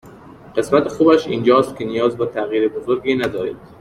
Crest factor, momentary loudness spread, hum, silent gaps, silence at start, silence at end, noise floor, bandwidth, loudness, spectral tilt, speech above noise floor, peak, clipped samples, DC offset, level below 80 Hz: 16 dB; 9 LU; none; none; 0.05 s; 0.05 s; -40 dBFS; 14 kHz; -18 LUFS; -6 dB/octave; 23 dB; -2 dBFS; under 0.1%; under 0.1%; -52 dBFS